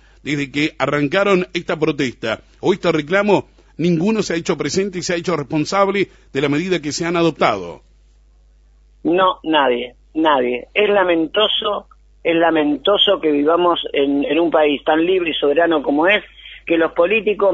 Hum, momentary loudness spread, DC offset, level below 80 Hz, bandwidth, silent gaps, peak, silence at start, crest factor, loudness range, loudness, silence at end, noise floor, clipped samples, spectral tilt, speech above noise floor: none; 7 LU; under 0.1%; -50 dBFS; 8 kHz; none; -2 dBFS; 0.25 s; 16 dB; 4 LU; -17 LUFS; 0 s; -50 dBFS; under 0.1%; -5 dB/octave; 33 dB